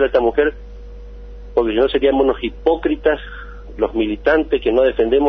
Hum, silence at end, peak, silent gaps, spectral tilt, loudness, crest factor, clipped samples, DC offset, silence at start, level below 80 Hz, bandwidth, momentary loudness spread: 50 Hz at -35 dBFS; 0 s; -4 dBFS; none; -7.5 dB/octave; -17 LUFS; 14 dB; under 0.1%; under 0.1%; 0 s; -34 dBFS; 6 kHz; 23 LU